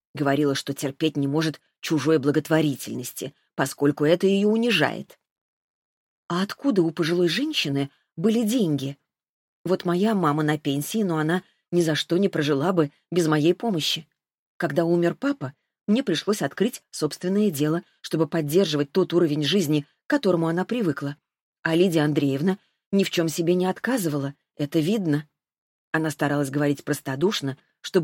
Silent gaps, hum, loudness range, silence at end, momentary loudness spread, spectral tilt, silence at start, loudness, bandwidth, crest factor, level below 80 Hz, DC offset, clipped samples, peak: 5.31-6.29 s, 9.29-9.65 s, 14.34-14.59 s, 21.41-21.53 s, 21.59-21.63 s, 22.86-22.91 s, 25.58-25.93 s; none; 2 LU; 0 s; 9 LU; -5.5 dB/octave; 0.15 s; -24 LUFS; 16.5 kHz; 20 dB; -70 dBFS; under 0.1%; under 0.1%; -4 dBFS